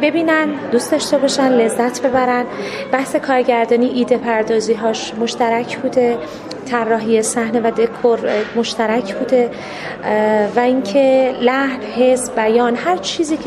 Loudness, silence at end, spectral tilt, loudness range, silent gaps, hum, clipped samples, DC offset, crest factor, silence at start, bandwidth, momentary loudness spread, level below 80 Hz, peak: -16 LUFS; 0 s; -4 dB/octave; 2 LU; none; none; under 0.1%; under 0.1%; 16 dB; 0 s; 14 kHz; 6 LU; -54 dBFS; 0 dBFS